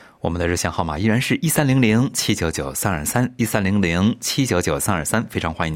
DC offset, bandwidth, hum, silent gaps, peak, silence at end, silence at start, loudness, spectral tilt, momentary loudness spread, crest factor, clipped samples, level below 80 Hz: under 0.1%; 16.5 kHz; none; none; -2 dBFS; 0 s; 0.25 s; -20 LUFS; -4.5 dB/octave; 6 LU; 18 dB; under 0.1%; -44 dBFS